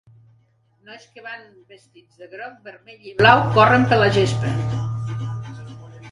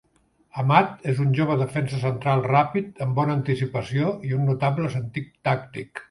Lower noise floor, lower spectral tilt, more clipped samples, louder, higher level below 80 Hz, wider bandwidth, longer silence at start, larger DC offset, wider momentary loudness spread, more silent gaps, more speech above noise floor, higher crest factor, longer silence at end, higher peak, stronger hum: about the same, -60 dBFS vs -63 dBFS; second, -6 dB/octave vs -8 dB/octave; neither; first, -17 LUFS vs -23 LUFS; first, -48 dBFS vs -58 dBFS; about the same, 11 kHz vs 11.5 kHz; first, 0.9 s vs 0.55 s; neither; first, 24 LU vs 8 LU; neither; about the same, 41 dB vs 41 dB; about the same, 20 dB vs 22 dB; about the same, 0 s vs 0.05 s; about the same, 0 dBFS vs -2 dBFS; neither